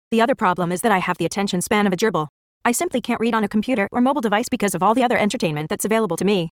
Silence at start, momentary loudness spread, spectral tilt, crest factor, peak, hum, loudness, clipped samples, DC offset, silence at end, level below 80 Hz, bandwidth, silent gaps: 0.1 s; 5 LU; -4.5 dB/octave; 16 dB; -4 dBFS; none; -20 LUFS; under 0.1%; under 0.1%; 0.1 s; -56 dBFS; 18 kHz; 2.29-2.61 s